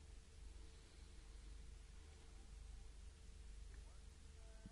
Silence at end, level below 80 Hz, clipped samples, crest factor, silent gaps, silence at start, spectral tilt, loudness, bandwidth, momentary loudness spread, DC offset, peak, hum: 0 s; -58 dBFS; under 0.1%; 14 dB; none; 0 s; -4.5 dB/octave; -62 LUFS; 11.5 kHz; 3 LU; under 0.1%; -44 dBFS; none